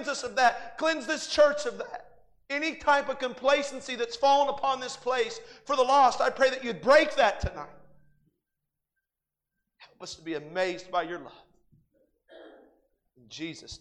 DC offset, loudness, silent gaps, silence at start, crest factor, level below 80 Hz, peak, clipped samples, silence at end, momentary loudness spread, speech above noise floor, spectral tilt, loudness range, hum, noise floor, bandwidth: under 0.1%; -26 LUFS; none; 0 s; 20 dB; -56 dBFS; -8 dBFS; under 0.1%; 0.05 s; 18 LU; 61 dB; -3 dB/octave; 12 LU; none; -88 dBFS; 10.5 kHz